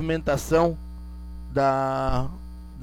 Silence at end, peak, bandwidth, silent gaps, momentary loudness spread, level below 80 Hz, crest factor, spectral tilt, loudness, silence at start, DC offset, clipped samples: 0 s; -8 dBFS; 17 kHz; none; 18 LU; -36 dBFS; 18 dB; -6.5 dB/octave; -24 LUFS; 0 s; under 0.1%; under 0.1%